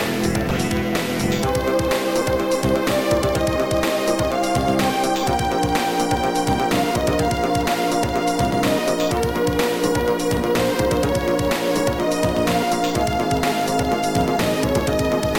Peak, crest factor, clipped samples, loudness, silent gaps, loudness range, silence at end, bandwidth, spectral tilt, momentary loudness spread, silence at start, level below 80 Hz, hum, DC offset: -4 dBFS; 16 dB; under 0.1%; -20 LUFS; none; 0 LU; 0 s; 17 kHz; -5 dB/octave; 1 LU; 0 s; -36 dBFS; none; under 0.1%